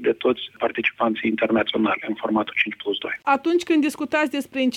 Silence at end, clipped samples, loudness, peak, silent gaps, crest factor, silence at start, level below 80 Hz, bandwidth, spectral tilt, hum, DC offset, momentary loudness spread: 0 s; under 0.1%; -22 LUFS; -6 dBFS; none; 16 dB; 0 s; -64 dBFS; 14.5 kHz; -4.5 dB/octave; none; under 0.1%; 5 LU